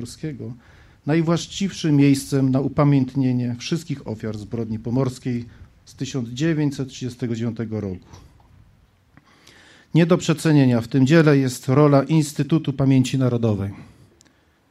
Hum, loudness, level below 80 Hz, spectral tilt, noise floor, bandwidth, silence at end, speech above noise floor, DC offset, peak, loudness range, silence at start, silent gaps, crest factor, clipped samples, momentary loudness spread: none; -20 LUFS; -52 dBFS; -7 dB/octave; -57 dBFS; 13.5 kHz; 0.85 s; 37 dB; under 0.1%; -2 dBFS; 9 LU; 0 s; none; 18 dB; under 0.1%; 14 LU